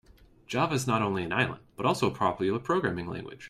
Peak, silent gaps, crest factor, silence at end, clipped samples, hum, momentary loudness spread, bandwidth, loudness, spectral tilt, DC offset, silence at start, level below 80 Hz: -12 dBFS; none; 18 dB; 0 s; under 0.1%; none; 5 LU; 15.5 kHz; -29 LUFS; -5.5 dB/octave; under 0.1%; 0.5 s; -60 dBFS